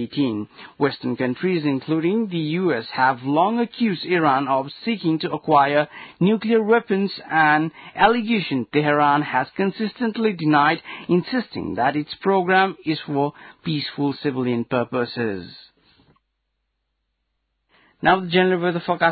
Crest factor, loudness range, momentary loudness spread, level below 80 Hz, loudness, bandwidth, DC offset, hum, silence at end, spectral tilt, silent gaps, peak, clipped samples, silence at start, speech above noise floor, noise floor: 18 dB; 7 LU; 8 LU; -60 dBFS; -21 LUFS; 4.8 kHz; under 0.1%; none; 0 s; -11 dB/octave; none; -4 dBFS; under 0.1%; 0 s; 54 dB; -75 dBFS